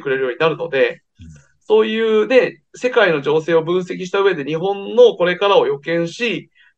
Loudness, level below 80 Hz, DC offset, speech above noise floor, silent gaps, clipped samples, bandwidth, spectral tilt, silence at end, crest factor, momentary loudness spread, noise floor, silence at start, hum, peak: -16 LUFS; -60 dBFS; under 0.1%; 26 dB; none; under 0.1%; 8.2 kHz; -5.5 dB/octave; 0.35 s; 16 dB; 8 LU; -42 dBFS; 0 s; none; 0 dBFS